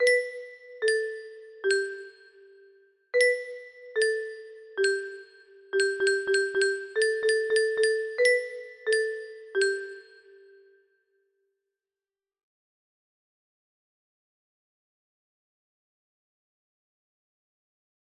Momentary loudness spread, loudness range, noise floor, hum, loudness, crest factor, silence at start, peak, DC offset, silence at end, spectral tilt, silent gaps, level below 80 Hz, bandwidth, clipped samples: 18 LU; 7 LU; under -90 dBFS; none; -27 LUFS; 20 dB; 0 s; -10 dBFS; under 0.1%; 8.05 s; -0.5 dB/octave; none; -78 dBFS; 11 kHz; under 0.1%